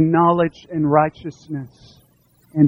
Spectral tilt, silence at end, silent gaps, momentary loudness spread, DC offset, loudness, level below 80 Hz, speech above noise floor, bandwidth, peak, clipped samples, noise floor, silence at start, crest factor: -9.5 dB/octave; 0 s; none; 17 LU; under 0.1%; -19 LUFS; -54 dBFS; 38 dB; 7 kHz; -2 dBFS; under 0.1%; -57 dBFS; 0 s; 18 dB